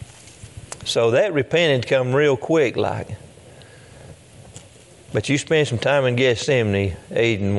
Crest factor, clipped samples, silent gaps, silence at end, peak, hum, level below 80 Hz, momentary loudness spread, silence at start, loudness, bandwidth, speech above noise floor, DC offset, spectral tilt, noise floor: 16 dB; under 0.1%; none; 0 s; -4 dBFS; none; -54 dBFS; 16 LU; 0 s; -20 LUFS; 11.5 kHz; 27 dB; under 0.1%; -5 dB/octave; -46 dBFS